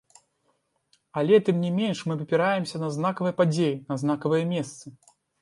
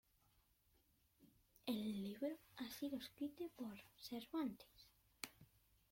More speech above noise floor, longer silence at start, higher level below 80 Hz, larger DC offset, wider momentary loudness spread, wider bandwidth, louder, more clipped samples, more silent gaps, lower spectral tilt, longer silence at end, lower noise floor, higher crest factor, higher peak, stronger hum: first, 47 dB vs 29 dB; about the same, 1.15 s vs 1.2 s; first, -72 dBFS vs -80 dBFS; neither; about the same, 10 LU vs 11 LU; second, 11.5 kHz vs 16.5 kHz; first, -25 LUFS vs -50 LUFS; neither; neither; first, -6.5 dB/octave vs -5 dB/octave; about the same, 0.5 s vs 0.45 s; second, -72 dBFS vs -79 dBFS; second, 18 dB vs 26 dB; first, -8 dBFS vs -26 dBFS; neither